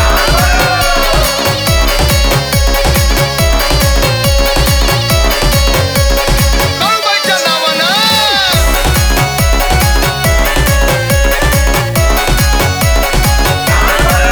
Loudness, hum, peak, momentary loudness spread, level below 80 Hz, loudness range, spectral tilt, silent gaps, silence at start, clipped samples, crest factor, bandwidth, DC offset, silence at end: -10 LUFS; none; 0 dBFS; 2 LU; -14 dBFS; 1 LU; -3.5 dB/octave; none; 0 s; under 0.1%; 10 dB; over 20 kHz; under 0.1%; 0 s